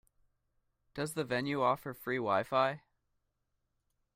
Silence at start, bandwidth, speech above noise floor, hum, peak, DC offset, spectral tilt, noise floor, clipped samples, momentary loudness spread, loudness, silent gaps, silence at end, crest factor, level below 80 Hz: 0.95 s; 16 kHz; 49 dB; none; -16 dBFS; under 0.1%; -5 dB/octave; -82 dBFS; under 0.1%; 9 LU; -34 LUFS; none; 1.4 s; 20 dB; -72 dBFS